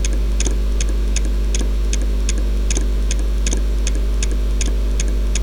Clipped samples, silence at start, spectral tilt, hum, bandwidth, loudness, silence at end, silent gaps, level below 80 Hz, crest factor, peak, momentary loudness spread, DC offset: under 0.1%; 0 s; -4.5 dB/octave; none; 11 kHz; -21 LUFS; 0 s; none; -18 dBFS; 14 dB; -2 dBFS; 1 LU; under 0.1%